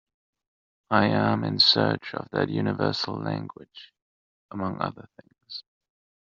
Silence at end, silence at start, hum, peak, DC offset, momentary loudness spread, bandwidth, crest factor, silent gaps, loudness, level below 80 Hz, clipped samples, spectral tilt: 0.65 s; 0.9 s; none; -6 dBFS; under 0.1%; 21 LU; 7.4 kHz; 22 dB; 4.02-4.49 s; -24 LUFS; -66 dBFS; under 0.1%; -3 dB/octave